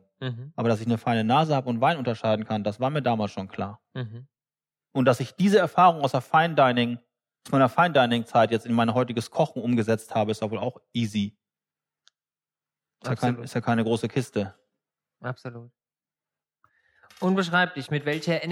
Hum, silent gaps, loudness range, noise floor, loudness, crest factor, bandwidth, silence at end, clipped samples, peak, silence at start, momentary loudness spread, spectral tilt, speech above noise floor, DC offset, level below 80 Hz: none; none; 10 LU; under -90 dBFS; -24 LUFS; 20 dB; 15 kHz; 0 s; under 0.1%; -6 dBFS; 0.2 s; 14 LU; -6.5 dB/octave; over 66 dB; under 0.1%; -72 dBFS